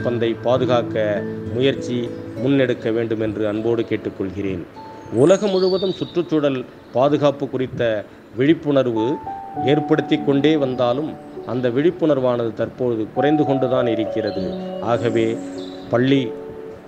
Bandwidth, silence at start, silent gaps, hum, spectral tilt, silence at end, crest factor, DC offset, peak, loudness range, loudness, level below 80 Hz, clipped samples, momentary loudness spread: 9.6 kHz; 0 s; none; none; -7 dB/octave; 0 s; 18 dB; under 0.1%; -2 dBFS; 2 LU; -20 LUFS; -56 dBFS; under 0.1%; 10 LU